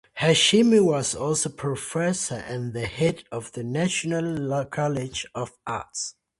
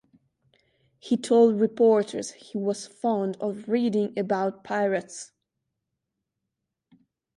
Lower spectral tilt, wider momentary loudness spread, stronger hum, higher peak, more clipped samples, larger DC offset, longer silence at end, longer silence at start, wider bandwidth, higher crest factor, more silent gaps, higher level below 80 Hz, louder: second, -4 dB/octave vs -5.5 dB/octave; about the same, 15 LU vs 13 LU; neither; about the same, -6 dBFS vs -8 dBFS; neither; neither; second, 0.3 s vs 2.1 s; second, 0.15 s vs 1.05 s; about the same, 11.5 kHz vs 11.5 kHz; about the same, 18 dB vs 20 dB; neither; first, -56 dBFS vs -74 dBFS; about the same, -24 LUFS vs -25 LUFS